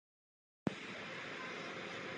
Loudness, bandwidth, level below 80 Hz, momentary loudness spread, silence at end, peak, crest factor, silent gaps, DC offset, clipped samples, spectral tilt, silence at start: -45 LUFS; 10 kHz; -76 dBFS; 2 LU; 0 s; -20 dBFS; 26 dB; none; under 0.1%; under 0.1%; -4.5 dB/octave; 0.65 s